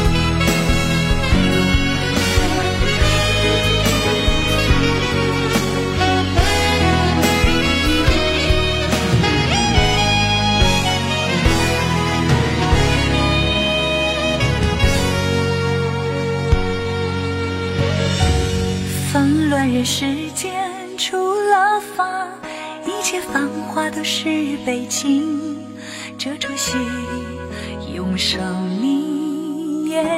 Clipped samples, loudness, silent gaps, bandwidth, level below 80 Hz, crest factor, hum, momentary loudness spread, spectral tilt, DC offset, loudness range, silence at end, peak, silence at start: under 0.1%; -17 LUFS; none; 16.5 kHz; -26 dBFS; 16 dB; none; 8 LU; -4.5 dB/octave; under 0.1%; 6 LU; 0 s; -2 dBFS; 0 s